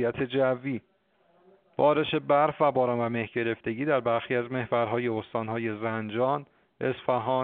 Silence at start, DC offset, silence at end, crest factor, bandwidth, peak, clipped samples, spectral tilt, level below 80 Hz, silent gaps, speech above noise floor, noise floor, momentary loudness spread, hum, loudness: 0 s; under 0.1%; 0 s; 18 dB; 4.4 kHz; -10 dBFS; under 0.1%; -4.5 dB/octave; -66 dBFS; none; 39 dB; -65 dBFS; 8 LU; none; -28 LUFS